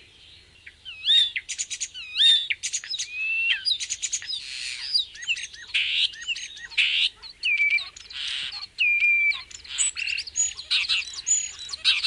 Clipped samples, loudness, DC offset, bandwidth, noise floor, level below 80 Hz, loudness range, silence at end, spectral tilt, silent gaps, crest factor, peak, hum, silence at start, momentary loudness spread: under 0.1%; -23 LUFS; under 0.1%; 11.5 kHz; -51 dBFS; -62 dBFS; 3 LU; 0 s; 4.5 dB/octave; none; 18 dB; -8 dBFS; none; 0.2 s; 12 LU